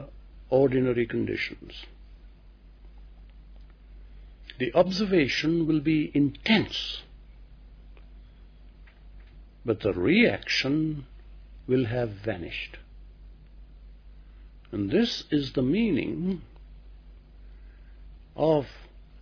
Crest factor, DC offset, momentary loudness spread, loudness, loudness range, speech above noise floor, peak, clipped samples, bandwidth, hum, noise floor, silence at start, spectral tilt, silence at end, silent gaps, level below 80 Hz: 22 dB; under 0.1%; 16 LU; -26 LUFS; 9 LU; 25 dB; -8 dBFS; under 0.1%; 5.4 kHz; none; -51 dBFS; 0 s; -6.5 dB/octave; 0 s; none; -48 dBFS